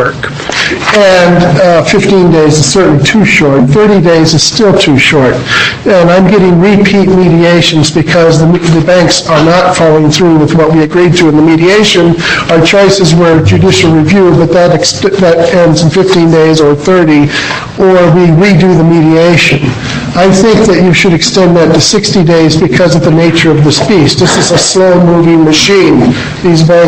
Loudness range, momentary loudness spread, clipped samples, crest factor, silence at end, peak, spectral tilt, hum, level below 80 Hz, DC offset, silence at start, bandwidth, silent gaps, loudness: 1 LU; 3 LU; 2%; 4 dB; 0 s; 0 dBFS; -5 dB/octave; none; -30 dBFS; 0.6%; 0 s; 8.8 kHz; none; -5 LUFS